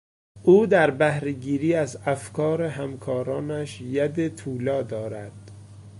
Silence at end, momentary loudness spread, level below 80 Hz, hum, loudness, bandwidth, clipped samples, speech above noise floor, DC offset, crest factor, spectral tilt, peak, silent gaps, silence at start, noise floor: 0 s; 13 LU; -58 dBFS; none; -24 LUFS; 11.5 kHz; under 0.1%; 20 dB; under 0.1%; 18 dB; -7 dB/octave; -6 dBFS; none; 0.35 s; -44 dBFS